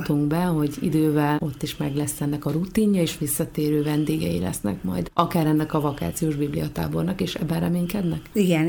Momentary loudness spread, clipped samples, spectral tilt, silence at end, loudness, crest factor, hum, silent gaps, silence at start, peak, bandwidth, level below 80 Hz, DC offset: 6 LU; under 0.1%; -6 dB/octave; 0 s; -24 LUFS; 18 dB; none; none; 0 s; -4 dBFS; 19.5 kHz; -46 dBFS; under 0.1%